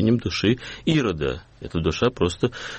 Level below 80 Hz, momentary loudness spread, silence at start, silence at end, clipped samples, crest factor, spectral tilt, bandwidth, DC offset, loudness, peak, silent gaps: -42 dBFS; 7 LU; 0 s; 0 s; under 0.1%; 16 dB; -6 dB/octave; 8.4 kHz; under 0.1%; -23 LUFS; -8 dBFS; none